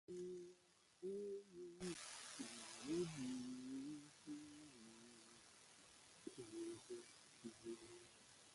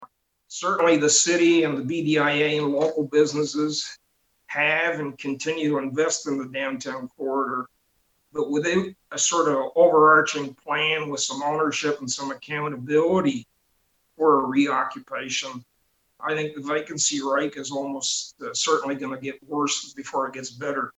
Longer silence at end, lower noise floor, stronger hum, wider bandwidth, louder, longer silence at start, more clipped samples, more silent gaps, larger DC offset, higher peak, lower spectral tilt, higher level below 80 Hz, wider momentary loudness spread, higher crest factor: about the same, 0 s vs 0.1 s; first, -74 dBFS vs -69 dBFS; neither; first, 11.5 kHz vs 9.2 kHz; second, -53 LUFS vs -23 LUFS; about the same, 0.1 s vs 0 s; neither; neither; neither; second, -34 dBFS vs -6 dBFS; about the same, -4 dB/octave vs -3 dB/octave; second, -84 dBFS vs -70 dBFS; first, 16 LU vs 12 LU; about the same, 20 dB vs 18 dB